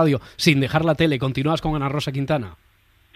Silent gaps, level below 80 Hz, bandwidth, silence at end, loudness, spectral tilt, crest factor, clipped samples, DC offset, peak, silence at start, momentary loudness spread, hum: none; -44 dBFS; 15 kHz; 0.6 s; -21 LUFS; -6 dB/octave; 20 dB; under 0.1%; under 0.1%; -2 dBFS; 0 s; 6 LU; none